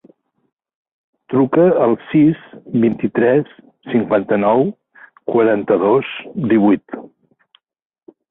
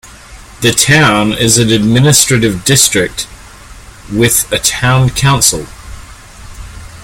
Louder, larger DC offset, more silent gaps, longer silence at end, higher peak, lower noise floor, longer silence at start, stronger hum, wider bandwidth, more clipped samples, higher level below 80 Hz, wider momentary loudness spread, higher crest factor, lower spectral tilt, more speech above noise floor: second, -16 LUFS vs -9 LUFS; neither; neither; first, 1.25 s vs 0 s; about the same, -2 dBFS vs 0 dBFS; first, -58 dBFS vs -34 dBFS; first, 1.3 s vs 0.05 s; neither; second, 4 kHz vs over 20 kHz; second, under 0.1% vs 0.2%; second, -58 dBFS vs -32 dBFS; second, 11 LU vs 15 LU; about the same, 14 dB vs 12 dB; first, -12 dB/octave vs -3.5 dB/octave; first, 43 dB vs 24 dB